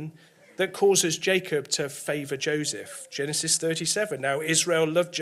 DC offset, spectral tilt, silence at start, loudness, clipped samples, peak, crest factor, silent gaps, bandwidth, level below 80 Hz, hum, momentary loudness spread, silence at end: under 0.1%; -2.5 dB/octave; 0 s; -25 LUFS; under 0.1%; -8 dBFS; 18 dB; none; 16 kHz; -72 dBFS; none; 10 LU; 0 s